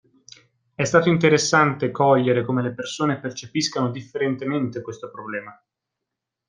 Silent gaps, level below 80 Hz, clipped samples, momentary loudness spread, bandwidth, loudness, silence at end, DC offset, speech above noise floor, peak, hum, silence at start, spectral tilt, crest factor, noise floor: none; -62 dBFS; under 0.1%; 15 LU; 10 kHz; -21 LUFS; 0.95 s; under 0.1%; 62 dB; -2 dBFS; none; 0.8 s; -5 dB/octave; 20 dB; -83 dBFS